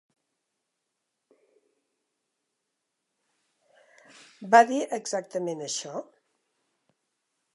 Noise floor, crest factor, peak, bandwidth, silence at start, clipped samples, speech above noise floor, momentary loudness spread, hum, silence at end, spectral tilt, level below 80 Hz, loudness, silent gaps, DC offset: -82 dBFS; 26 dB; -4 dBFS; 11.5 kHz; 4.4 s; under 0.1%; 57 dB; 19 LU; none; 1.55 s; -3 dB/octave; under -90 dBFS; -25 LUFS; none; under 0.1%